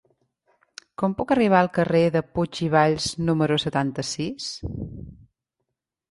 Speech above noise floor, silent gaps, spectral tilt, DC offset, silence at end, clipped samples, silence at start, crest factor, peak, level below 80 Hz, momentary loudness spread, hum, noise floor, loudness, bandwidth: 58 dB; none; -5.5 dB/octave; under 0.1%; 1 s; under 0.1%; 1 s; 20 dB; -4 dBFS; -50 dBFS; 14 LU; none; -81 dBFS; -23 LUFS; 11.5 kHz